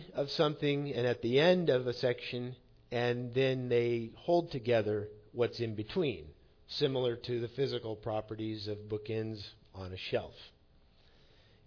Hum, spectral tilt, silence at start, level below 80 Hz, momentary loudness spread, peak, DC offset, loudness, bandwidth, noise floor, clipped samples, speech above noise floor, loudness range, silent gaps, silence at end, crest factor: none; -5 dB/octave; 0 s; -64 dBFS; 12 LU; -16 dBFS; under 0.1%; -34 LUFS; 5.4 kHz; -64 dBFS; under 0.1%; 31 dB; 8 LU; none; 1.2 s; 18 dB